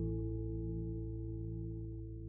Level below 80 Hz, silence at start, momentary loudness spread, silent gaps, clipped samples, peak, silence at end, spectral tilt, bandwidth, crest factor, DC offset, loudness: -46 dBFS; 0 s; 5 LU; none; under 0.1%; -28 dBFS; 0 s; -13 dB/octave; 1.2 kHz; 12 dB; under 0.1%; -42 LUFS